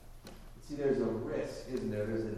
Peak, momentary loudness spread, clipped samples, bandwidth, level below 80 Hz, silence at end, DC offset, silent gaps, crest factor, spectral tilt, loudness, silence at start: -20 dBFS; 21 LU; under 0.1%; 14 kHz; -52 dBFS; 0 s; under 0.1%; none; 16 dB; -7 dB/octave; -36 LUFS; 0 s